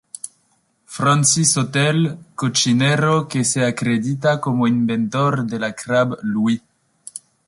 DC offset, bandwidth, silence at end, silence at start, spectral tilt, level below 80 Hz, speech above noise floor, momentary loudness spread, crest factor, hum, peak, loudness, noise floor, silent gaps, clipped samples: under 0.1%; 11.5 kHz; 0.3 s; 0.25 s; -4.5 dB/octave; -58 dBFS; 45 dB; 14 LU; 16 dB; none; -4 dBFS; -18 LUFS; -63 dBFS; none; under 0.1%